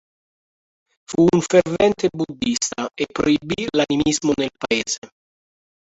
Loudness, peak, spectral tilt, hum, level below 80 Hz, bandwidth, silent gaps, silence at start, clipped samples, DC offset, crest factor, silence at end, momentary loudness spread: -20 LUFS; -2 dBFS; -4.5 dB/octave; none; -50 dBFS; 8.2 kHz; 4.98-5.02 s; 1.1 s; under 0.1%; under 0.1%; 18 dB; 0.9 s; 9 LU